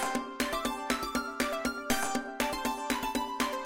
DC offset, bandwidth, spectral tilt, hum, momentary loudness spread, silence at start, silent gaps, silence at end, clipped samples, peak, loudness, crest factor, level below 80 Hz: under 0.1%; 17 kHz; -2.5 dB/octave; none; 3 LU; 0 s; none; 0 s; under 0.1%; -14 dBFS; -32 LUFS; 20 dB; -52 dBFS